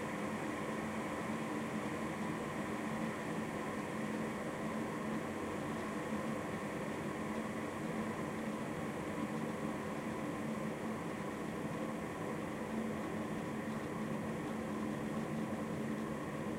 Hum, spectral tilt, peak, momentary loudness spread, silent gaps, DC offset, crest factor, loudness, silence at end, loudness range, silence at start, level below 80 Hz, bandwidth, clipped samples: none; -6 dB/octave; -26 dBFS; 1 LU; none; under 0.1%; 14 dB; -41 LUFS; 0 s; 1 LU; 0 s; -66 dBFS; 16 kHz; under 0.1%